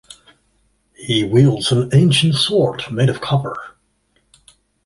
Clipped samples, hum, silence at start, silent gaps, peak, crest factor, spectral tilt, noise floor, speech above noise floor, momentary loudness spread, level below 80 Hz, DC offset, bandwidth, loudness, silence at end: under 0.1%; none; 1 s; none; -2 dBFS; 16 dB; -6 dB/octave; -63 dBFS; 48 dB; 9 LU; -50 dBFS; under 0.1%; 11.5 kHz; -16 LUFS; 1.15 s